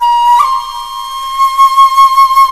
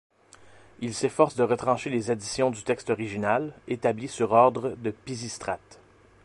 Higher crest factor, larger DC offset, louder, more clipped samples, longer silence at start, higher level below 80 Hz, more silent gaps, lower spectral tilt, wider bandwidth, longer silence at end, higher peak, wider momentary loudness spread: second, 8 dB vs 22 dB; neither; first, -7 LUFS vs -27 LUFS; first, 1% vs under 0.1%; second, 0 s vs 0.8 s; first, -40 dBFS vs -60 dBFS; neither; second, 2 dB/octave vs -5 dB/octave; first, 14.5 kHz vs 11.5 kHz; second, 0 s vs 0.5 s; first, 0 dBFS vs -6 dBFS; about the same, 14 LU vs 13 LU